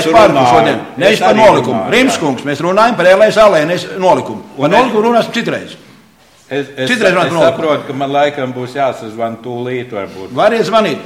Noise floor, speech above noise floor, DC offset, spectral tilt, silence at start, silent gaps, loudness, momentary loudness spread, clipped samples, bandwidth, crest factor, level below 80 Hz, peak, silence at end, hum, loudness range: -45 dBFS; 34 dB; under 0.1%; -5 dB/octave; 0 s; none; -11 LUFS; 13 LU; 0.1%; 15.5 kHz; 12 dB; -46 dBFS; 0 dBFS; 0 s; none; 6 LU